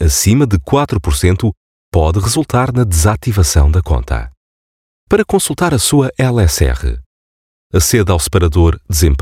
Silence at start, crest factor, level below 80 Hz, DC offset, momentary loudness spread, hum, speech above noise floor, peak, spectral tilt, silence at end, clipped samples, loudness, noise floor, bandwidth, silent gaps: 0 s; 12 dB; -20 dBFS; under 0.1%; 7 LU; none; over 78 dB; -2 dBFS; -5 dB/octave; 0 s; under 0.1%; -13 LUFS; under -90 dBFS; 16 kHz; 1.57-1.92 s, 4.37-5.07 s, 7.06-7.70 s